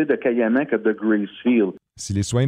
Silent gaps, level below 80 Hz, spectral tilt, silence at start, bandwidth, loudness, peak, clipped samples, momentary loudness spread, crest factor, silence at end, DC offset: none; -52 dBFS; -6.5 dB/octave; 0 s; 11.5 kHz; -21 LUFS; -6 dBFS; under 0.1%; 6 LU; 14 dB; 0 s; under 0.1%